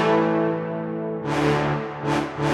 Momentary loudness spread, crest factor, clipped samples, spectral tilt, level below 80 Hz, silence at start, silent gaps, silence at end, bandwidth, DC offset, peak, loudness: 8 LU; 16 dB; under 0.1%; -6.5 dB/octave; -50 dBFS; 0 s; none; 0 s; 12.5 kHz; under 0.1%; -8 dBFS; -24 LUFS